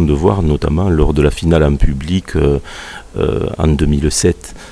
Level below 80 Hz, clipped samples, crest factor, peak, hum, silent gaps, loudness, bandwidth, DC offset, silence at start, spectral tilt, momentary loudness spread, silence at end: -20 dBFS; under 0.1%; 14 dB; 0 dBFS; none; none; -14 LUFS; 13 kHz; under 0.1%; 0 s; -6 dB/octave; 7 LU; 0 s